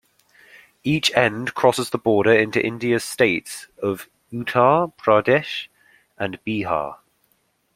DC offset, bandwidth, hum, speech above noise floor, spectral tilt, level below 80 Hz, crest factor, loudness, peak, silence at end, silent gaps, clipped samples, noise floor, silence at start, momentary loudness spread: under 0.1%; 16.5 kHz; none; 46 dB; -4.5 dB/octave; -58 dBFS; 22 dB; -20 LUFS; 0 dBFS; 0.8 s; none; under 0.1%; -66 dBFS; 0.85 s; 13 LU